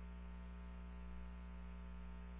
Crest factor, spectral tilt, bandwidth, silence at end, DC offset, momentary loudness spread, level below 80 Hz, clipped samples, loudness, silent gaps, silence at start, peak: 8 dB; -7 dB/octave; 3.9 kHz; 0 s; under 0.1%; 0 LU; -52 dBFS; under 0.1%; -54 LUFS; none; 0 s; -42 dBFS